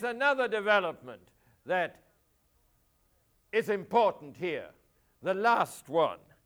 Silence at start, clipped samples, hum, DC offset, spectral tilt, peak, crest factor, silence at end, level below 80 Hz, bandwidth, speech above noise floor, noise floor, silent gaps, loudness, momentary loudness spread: 0 s; under 0.1%; none; under 0.1%; -4.5 dB/octave; -12 dBFS; 20 dB; 0.3 s; -74 dBFS; over 20 kHz; 41 dB; -70 dBFS; none; -30 LUFS; 12 LU